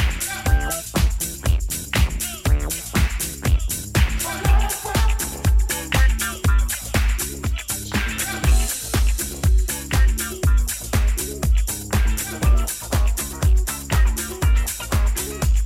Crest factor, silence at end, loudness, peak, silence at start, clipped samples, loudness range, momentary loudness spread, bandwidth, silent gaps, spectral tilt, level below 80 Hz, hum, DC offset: 16 dB; 0 s; -22 LUFS; -4 dBFS; 0 s; under 0.1%; 1 LU; 4 LU; 16.5 kHz; none; -4 dB/octave; -20 dBFS; none; under 0.1%